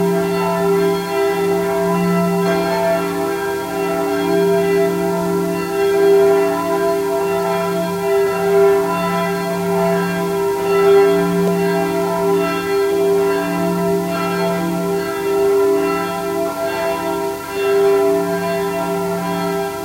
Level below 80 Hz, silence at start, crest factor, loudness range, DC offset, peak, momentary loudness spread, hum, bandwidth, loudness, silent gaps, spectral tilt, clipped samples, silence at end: -50 dBFS; 0 s; 14 dB; 3 LU; under 0.1%; -2 dBFS; 6 LU; none; 16 kHz; -17 LUFS; none; -6 dB/octave; under 0.1%; 0 s